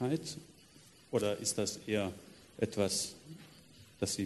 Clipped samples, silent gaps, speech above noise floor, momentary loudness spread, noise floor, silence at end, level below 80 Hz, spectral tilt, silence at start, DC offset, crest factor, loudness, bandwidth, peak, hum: under 0.1%; none; 25 dB; 21 LU; -60 dBFS; 0 s; -70 dBFS; -4 dB/octave; 0 s; under 0.1%; 20 dB; -36 LUFS; 12 kHz; -16 dBFS; none